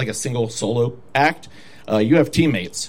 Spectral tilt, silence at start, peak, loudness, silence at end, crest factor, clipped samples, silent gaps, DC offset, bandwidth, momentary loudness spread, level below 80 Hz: -5 dB/octave; 0 s; -4 dBFS; -19 LUFS; 0 s; 16 dB; under 0.1%; none; 0.9%; 16.5 kHz; 7 LU; -48 dBFS